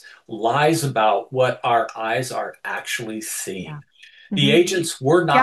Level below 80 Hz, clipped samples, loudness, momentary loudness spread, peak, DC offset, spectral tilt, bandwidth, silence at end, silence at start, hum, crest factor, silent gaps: -68 dBFS; under 0.1%; -20 LUFS; 13 LU; -2 dBFS; under 0.1%; -4.5 dB/octave; 12.5 kHz; 0 s; 0.05 s; none; 20 dB; none